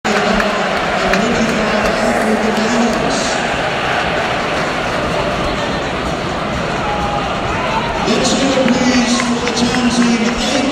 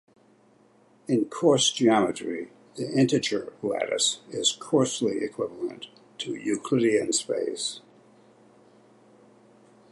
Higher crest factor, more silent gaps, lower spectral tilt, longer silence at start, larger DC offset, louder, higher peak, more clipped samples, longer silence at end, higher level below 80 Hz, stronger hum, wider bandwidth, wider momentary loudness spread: about the same, 16 dB vs 20 dB; neither; about the same, -4 dB/octave vs -3.5 dB/octave; second, 0.05 s vs 1.1 s; neither; first, -15 LUFS vs -26 LUFS; first, 0 dBFS vs -8 dBFS; neither; second, 0 s vs 2.15 s; first, -34 dBFS vs -72 dBFS; neither; first, 14.5 kHz vs 11.5 kHz; second, 5 LU vs 15 LU